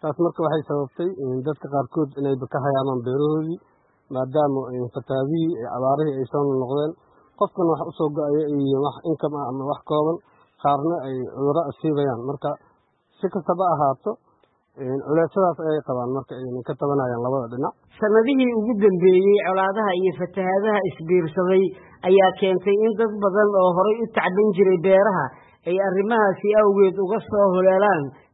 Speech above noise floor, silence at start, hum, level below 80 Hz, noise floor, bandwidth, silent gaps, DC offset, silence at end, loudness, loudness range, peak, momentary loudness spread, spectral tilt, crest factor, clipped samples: 43 dB; 0 s; none; -64 dBFS; -63 dBFS; 4.1 kHz; none; under 0.1%; 0.25 s; -21 LUFS; 6 LU; -4 dBFS; 11 LU; -12 dB/octave; 16 dB; under 0.1%